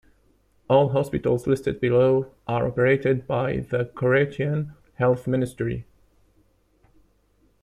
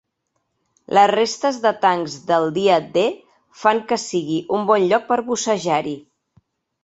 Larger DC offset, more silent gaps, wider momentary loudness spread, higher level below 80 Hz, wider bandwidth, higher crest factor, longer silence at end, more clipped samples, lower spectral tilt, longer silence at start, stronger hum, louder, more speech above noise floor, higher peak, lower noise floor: neither; neither; about the same, 9 LU vs 7 LU; first, -50 dBFS vs -64 dBFS; first, 13 kHz vs 8.2 kHz; about the same, 18 dB vs 18 dB; first, 1.8 s vs 0.85 s; neither; first, -8 dB/octave vs -4 dB/octave; second, 0.7 s vs 0.9 s; neither; second, -23 LUFS vs -19 LUFS; second, 41 dB vs 55 dB; second, -6 dBFS vs -2 dBFS; second, -63 dBFS vs -73 dBFS